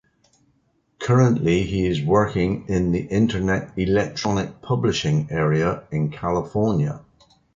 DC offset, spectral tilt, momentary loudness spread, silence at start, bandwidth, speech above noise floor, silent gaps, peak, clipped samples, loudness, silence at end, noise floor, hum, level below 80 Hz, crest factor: under 0.1%; -7 dB/octave; 7 LU; 1 s; 7.6 kHz; 45 dB; none; -4 dBFS; under 0.1%; -22 LUFS; 0.6 s; -65 dBFS; none; -42 dBFS; 16 dB